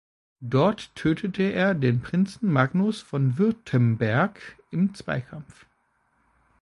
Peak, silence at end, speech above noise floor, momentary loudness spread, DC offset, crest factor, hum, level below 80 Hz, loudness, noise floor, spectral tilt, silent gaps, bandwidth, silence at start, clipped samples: -6 dBFS; 1.2 s; 45 dB; 9 LU; under 0.1%; 20 dB; none; -58 dBFS; -24 LUFS; -69 dBFS; -8 dB/octave; none; 11.5 kHz; 0.4 s; under 0.1%